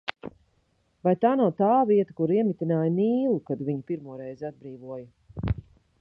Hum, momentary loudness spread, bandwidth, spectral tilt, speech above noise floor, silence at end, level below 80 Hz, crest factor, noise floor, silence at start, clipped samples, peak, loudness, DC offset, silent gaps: none; 18 LU; 6 kHz; -10 dB/octave; 44 dB; 0.4 s; -48 dBFS; 20 dB; -69 dBFS; 0.05 s; under 0.1%; -6 dBFS; -25 LUFS; under 0.1%; none